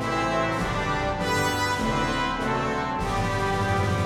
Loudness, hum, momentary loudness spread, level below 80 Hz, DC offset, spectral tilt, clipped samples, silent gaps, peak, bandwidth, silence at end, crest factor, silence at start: -25 LUFS; none; 2 LU; -38 dBFS; under 0.1%; -5 dB/octave; under 0.1%; none; -10 dBFS; 18.5 kHz; 0 s; 14 dB; 0 s